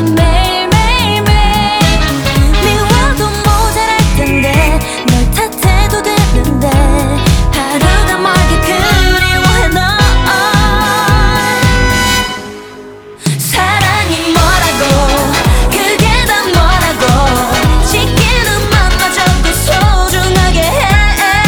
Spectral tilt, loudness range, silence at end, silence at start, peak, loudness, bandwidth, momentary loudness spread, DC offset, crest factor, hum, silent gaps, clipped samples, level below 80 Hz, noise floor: -4 dB/octave; 2 LU; 0 s; 0 s; 0 dBFS; -10 LUFS; over 20 kHz; 3 LU; under 0.1%; 10 dB; none; none; 0.2%; -14 dBFS; -30 dBFS